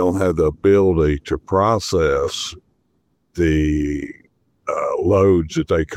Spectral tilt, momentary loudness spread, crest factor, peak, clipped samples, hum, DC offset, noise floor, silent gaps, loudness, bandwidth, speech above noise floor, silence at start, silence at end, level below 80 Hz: -6.5 dB/octave; 12 LU; 14 dB; -4 dBFS; under 0.1%; none; under 0.1%; -66 dBFS; none; -18 LUFS; 13.5 kHz; 49 dB; 0 s; 0 s; -34 dBFS